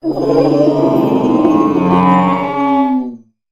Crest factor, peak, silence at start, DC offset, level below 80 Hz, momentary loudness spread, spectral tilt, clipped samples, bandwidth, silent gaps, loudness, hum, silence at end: 12 dB; 0 dBFS; 0.05 s; under 0.1%; -46 dBFS; 4 LU; -8.5 dB/octave; under 0.1%; 14 kHz; none; -12 LUFS; none; 0.35 s